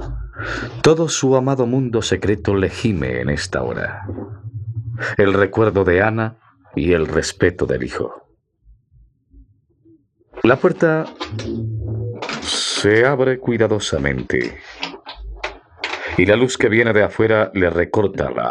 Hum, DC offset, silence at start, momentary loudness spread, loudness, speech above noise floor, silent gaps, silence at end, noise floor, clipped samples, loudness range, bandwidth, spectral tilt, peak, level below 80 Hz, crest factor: none; under 0.1%; 0 s; 14 LU; -18 LUFS; 37 dB; none; 0 s; -54 dBFS; under 0.1%; 5 LU; 11.5 kHz; -5 dB/octave; 0 dBFS; -40 dBFS; 18 dB